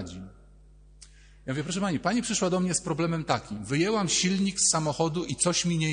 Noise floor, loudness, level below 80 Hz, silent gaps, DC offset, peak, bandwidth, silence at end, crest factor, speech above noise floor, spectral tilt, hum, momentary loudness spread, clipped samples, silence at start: -53 dBFS; -26 LUFS; -54 dBFS; none; under 0.1%; -10 dBFS; 10 kHz; 0 s; 18 dB; 26 dB; -4 dB/octave; none; 9 LU; under 0.1%; 0 s